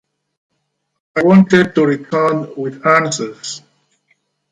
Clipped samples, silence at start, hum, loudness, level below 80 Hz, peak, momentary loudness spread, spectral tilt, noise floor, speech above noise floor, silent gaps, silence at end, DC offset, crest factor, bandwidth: under 0.1%; 1.15 s; none; -14 LUFS; -60 dBFS; 0 dBFS; 15 LU; -6 dB/octave; -70 dBFS; 57 dB; none; 0.95 s; under 0.1%; 16 dB; 9.4 kHz